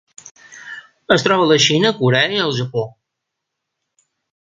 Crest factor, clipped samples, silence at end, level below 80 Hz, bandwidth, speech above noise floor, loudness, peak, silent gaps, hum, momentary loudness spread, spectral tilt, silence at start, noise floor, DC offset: 18 dB; under 0.1%; 1.5 s; -58 dBFS; 9.4 kHz; 64 dB; -15 LUFS; 0 dBFS; 0.31-0.35 s; none; 22 LU; -4 dB/octave; 0.25 s; -79 dBFS; under 0.1%